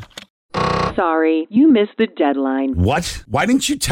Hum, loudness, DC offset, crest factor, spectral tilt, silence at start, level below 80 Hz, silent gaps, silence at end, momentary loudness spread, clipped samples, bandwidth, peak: none; -17 LUFS; under 0.1%; 12 dB; -5 dB/octave; 0 s; -38 dBFS; 0.30-0.49 s; 0 s; 8 LU; under 0.1%; 16.5 kHz; -6 dBFS